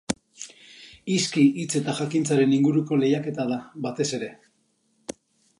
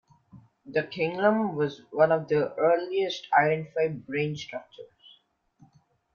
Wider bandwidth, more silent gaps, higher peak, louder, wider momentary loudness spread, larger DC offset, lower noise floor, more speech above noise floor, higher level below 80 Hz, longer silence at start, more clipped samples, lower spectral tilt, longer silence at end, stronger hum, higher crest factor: first, 11.5 kHz vs 7.2 kHz; neither; about the same, -8 dBFS vs -8 dBFS; about the same, -24 LUFS vs -26 LUFS; first, 20 LU vs 8 LU; neither; first, -68 dBFS vs -64 dBFS; first, 45 dB vs 38 dB; about the same, -66 dBFS vs -70 dBFS; second, 0.1 s vs 0.35 s; neither; second, -5 dB/octave vs -6.5 dB/octave; second, 0.5 s vs 1.3 s; neither; about the same, 18 dB vs 20 dB